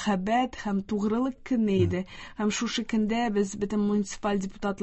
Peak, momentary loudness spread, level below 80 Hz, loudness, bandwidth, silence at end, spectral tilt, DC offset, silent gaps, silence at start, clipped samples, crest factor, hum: -12 dBFS; 5 LU; -50 dBFS; -28 LUFS; 8.4 kHz; 0 s; -5.5 dB/octave; under 0.1%; none; 0 s; under 0.1%; 14 dB; none